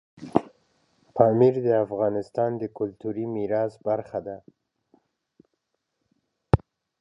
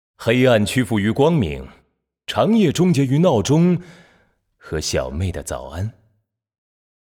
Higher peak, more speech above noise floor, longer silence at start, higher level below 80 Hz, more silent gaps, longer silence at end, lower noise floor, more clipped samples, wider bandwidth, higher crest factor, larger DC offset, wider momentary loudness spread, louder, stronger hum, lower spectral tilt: about the same, -2 dBFS vs -4 dBFS; first, 54 dB vs 48 dB; about the same, 0.2 s vs 0.2 s; second, -48 dBFS vs -42 dBFS; neither; second, 0.45 s vs 1.1 s; first, -79 dBFS vs -66 dBFS; neither; second, 7.8 kHz vs 16.5 kHz; first, 26 dB vs 16 dB; neither; about the same, 13 LU vs 13 LU; second, -25 LUFS vs -18 LUFS; neither; first, -10 dB/octave vs -6 dB/octave